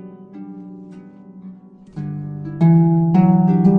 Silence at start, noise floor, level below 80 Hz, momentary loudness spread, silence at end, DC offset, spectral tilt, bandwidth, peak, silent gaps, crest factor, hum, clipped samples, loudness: 0 s; -40 dBFS; -54 dBFS; 24 LU; 0 s; under 0.1%; -12 dB/octave; 2.8 kHz; -4 dBFS; none; 14 dB; none; under 0.1%; -15 LUFS